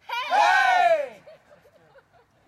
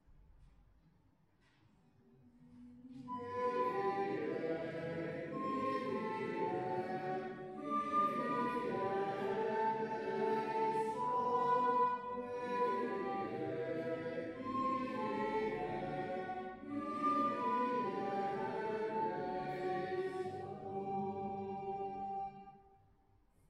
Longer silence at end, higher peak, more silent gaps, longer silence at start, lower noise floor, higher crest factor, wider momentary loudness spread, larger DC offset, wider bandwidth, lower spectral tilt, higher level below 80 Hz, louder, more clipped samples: first, 1.15 s vs 0.9 s; first, -10 dBFS vs -22 dBFS; neither; about the same, 0.1 s vs 0.1 s; second, -58 dBFS vs -72 dBFS; about the same, 14 dB vs 16 dB; about the same, 8 LU vs 9 LU; neither; first, 14 kHz vs 12 kHz; second, -0.5 dB/octave vs -7 dB/octave; about the same, -72 dBFS vs -72 dBFS; first, -20 LUFS vs -39 LUFS; neither